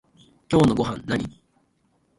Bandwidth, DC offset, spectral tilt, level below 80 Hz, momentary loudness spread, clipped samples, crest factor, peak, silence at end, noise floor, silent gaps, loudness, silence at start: 11.5 kHz; under 0.1%; -7 dB/octave; -50 dBFS; 9 LU; under 0.1%; 18 dB; -6 dBFS; 0.9 s; -66 dBFS; none; -22 LUFS; 0.5 s